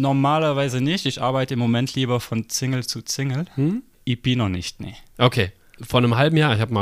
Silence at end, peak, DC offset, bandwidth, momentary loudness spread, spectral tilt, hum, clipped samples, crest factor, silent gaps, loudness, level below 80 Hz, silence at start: 0 s; -2 dBFS; under 0.1%; 15.5 kHz; 10 LU; -5.5 dB/octave; none; under 0.1%; 18 dB; none; -21 LUFS; -50 dBFS; 0 s